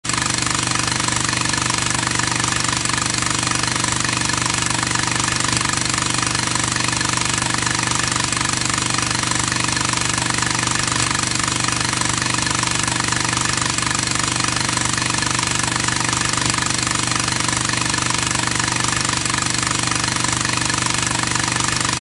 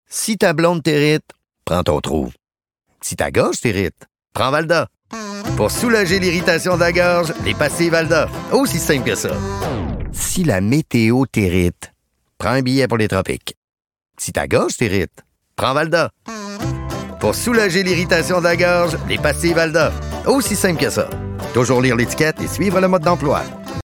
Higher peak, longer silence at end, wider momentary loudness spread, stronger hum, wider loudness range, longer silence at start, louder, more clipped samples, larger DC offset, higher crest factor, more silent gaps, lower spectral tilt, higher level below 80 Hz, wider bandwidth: about the same, -2 dBFS vs -2 dBFS; about the same, 0.05 s vs 0.1 s; second, 1 LU vs 11 LU; neither; second, 0 LU vs 4 LU; about the same, 0.05 s vs 0.1 s; about the same, -18 LUFS vs -17 LUFS; neither; first, 0.2% vs under 0.1%; about the same, 18 dB vs 14 dB; second, none vs 13.57-13.62 s, 13.69-13.73 s; second, -2 dB/octave vs -4.5 dB/octave; about the same, -40 dBFS vs -36 dBFS; second, 12 kHz vs 19 kHz